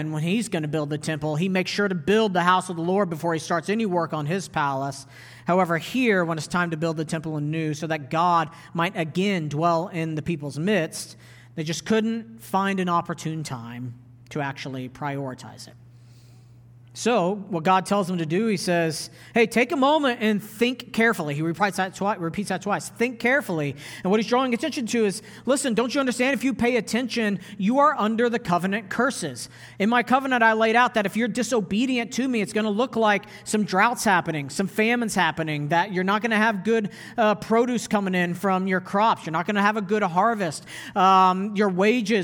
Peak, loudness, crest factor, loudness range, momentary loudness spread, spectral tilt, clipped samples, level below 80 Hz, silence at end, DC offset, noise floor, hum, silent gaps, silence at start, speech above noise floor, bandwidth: -4 dBFS; -23 LUFS; 20 dB; 5 LU; 10 LU; -5 dB/octave; under 0.1%; -62 dBFS; 0 s; under 0.1%; -49 dBFS; none; none; 0 s; 26 dB; 20 kHz